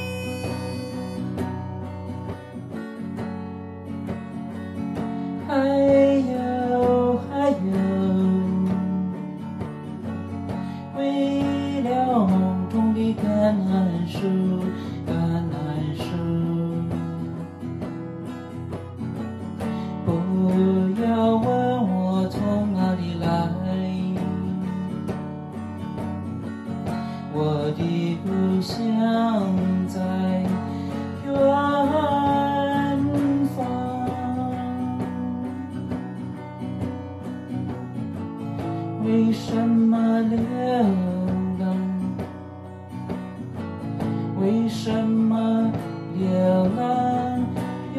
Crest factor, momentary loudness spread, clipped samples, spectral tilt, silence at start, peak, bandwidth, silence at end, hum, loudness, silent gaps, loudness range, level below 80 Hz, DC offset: 16 dB; 13 LU; under 0.1%; -8 dB/octave; 0 s; -8 dBFS; 12.5 kHz; 0 s; none; -24 LUFS; none; 8 LU; -56 dBFS; under 0.1%